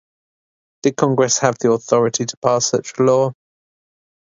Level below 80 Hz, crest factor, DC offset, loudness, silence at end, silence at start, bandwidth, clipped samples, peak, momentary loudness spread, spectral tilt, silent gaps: -62 dBFS; 18 dB; under 0.1%; -17 LUFS; 0.9 s; 0.85 s; 7.8 kHz; under 0.1%; 0 dBFS; 5 LU; -4.5 dB/octave; 2.37-2.42 s